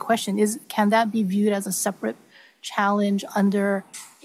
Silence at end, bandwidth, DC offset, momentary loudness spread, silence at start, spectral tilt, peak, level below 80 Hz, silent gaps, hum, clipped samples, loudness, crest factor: 0.15 s; 15.5 kHz; under 0.1%; 11 LU; 0 s; -5 dB/octave; -8 dBFS; -80 dBFS; none; none; under 0.1%; -23 LUFS; 16 dB